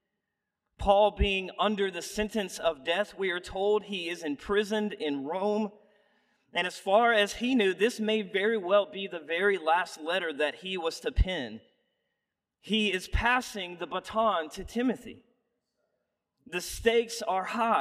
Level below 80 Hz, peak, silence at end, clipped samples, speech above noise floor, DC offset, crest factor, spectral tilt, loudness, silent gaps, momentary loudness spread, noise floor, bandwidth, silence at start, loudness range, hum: -44 dBFS; -10 dBFS; 0 s; under 0.1%; 57 dB; under 0.1%; 20 dB; -4.5 dB/octave; -29 LUFS; none; 10 LU; -85 dBFS; 15.5 kHz; 0.8 s; 5 LU; none